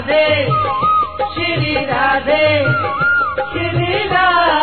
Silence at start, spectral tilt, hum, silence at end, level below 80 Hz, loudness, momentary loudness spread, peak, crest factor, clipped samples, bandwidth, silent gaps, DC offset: 0 s; -8.5 dB/octave; none; 0 s; -40 dBFS; -15 LUFS; 6 LU; -2 dBFS; 12 dB; under 0.1%; 4.6 kHz; none; 1%